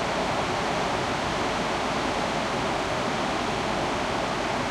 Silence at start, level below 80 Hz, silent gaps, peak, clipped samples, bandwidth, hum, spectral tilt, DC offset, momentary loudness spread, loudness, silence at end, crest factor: 0 s; -46 dBFS; none; -14 dBFS; under 0.1%; 15.5 kHz; none; -4 dB/octave; under 0.1%; 1 LU; -26 LUFS; 0 s; 12 dB